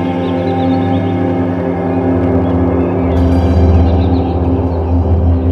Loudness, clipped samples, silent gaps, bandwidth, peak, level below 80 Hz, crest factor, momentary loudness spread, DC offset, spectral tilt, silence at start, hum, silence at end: -13 LUFS; under 0.1%; none; 5 kHz; 0 dBFS; -20 dBFS; 12 dB; 5 LU; under 0.1%; -10 dB/octave; 0 s; 50 Hz at -30 dBFS; 0 s